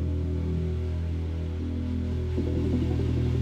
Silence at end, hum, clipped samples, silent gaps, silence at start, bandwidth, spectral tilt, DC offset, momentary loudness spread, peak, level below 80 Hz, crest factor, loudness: 0 s; none; under 0.1%; none; 0 s; 6.8 kHz; -9 dB/octave; under 0.1%; 5 LU; -14 dBFS; -38 dBFS; 12 dB; -29 LUFS